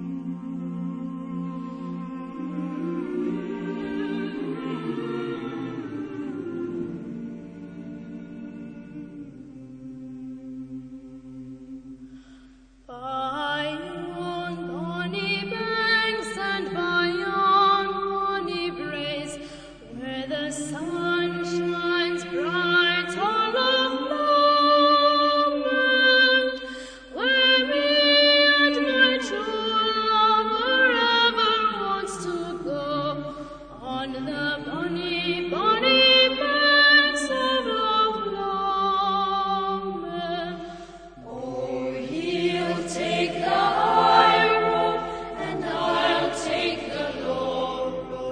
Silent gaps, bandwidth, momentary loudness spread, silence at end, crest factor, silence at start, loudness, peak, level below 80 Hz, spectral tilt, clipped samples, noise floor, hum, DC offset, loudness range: none; 9.8 kHz; 21 LU; 0 s; 22 dB; 0 s; -22 LUFS; -4 dBFS; -54 dBFS; -4 dB/octave; under 0.1%; -52 dBFS; none; under 0.1%; 16 LU